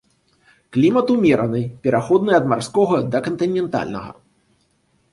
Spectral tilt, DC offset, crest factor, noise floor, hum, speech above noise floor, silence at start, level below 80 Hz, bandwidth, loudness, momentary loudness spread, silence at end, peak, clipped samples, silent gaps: -7 dB/octave; under 0.1%; 16 dB; -63 dBFS; none; 45 dB; 0.7 s; -54 dBFS; 11.5 kHz; -18 LUFS; 9 LU; 1 s; -2 dBFS; under 0.1%; none